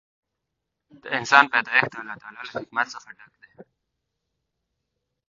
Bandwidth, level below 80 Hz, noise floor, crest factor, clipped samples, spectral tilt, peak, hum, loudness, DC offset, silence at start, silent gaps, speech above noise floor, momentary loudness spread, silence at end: 7.4 kHz; -70 dBFS; -82 dBFS; 26 dB; under 0.1%; 0 dB/octave; 0 dBFS; none; -21 LUFS; under 0.1%; 1.05 s; none; 58 dB; 21 LU; 1.65 s